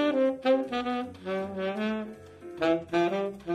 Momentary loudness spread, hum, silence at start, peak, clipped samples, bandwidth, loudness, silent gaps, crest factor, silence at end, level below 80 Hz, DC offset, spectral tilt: 9 LU; none; 0 s; -12 dBFS; under 0.1%; 10.5 kHz; -29 LUFS; none; 16 dB; 0 s; -62 dBFS; under 0.1%; -6.5 dB/octave